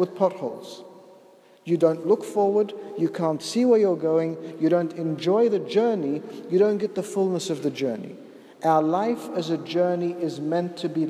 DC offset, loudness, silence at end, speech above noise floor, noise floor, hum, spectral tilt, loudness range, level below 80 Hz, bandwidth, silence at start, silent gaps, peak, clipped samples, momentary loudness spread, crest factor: under 0.1%; -24 LUFS; 0 s; 30 dB; -53 dBFS; none; -6.5 dB/octave; 3 LU; -80 dBFS; 14 kHz; 0 s; none; -6 dBFS; under 0.1%; 10 LU; 18 dB